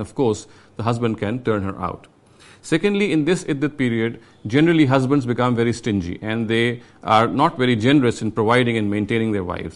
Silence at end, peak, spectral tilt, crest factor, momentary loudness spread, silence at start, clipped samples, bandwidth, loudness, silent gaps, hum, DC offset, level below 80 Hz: 0.05 s; -2 dBFS; -6.5 dB/octave; 18 dB; 11 LU; 0 s; under 0.1%; 11.5 kHz; -20 LUFS; none; none; under 0.1%; -50 dBFS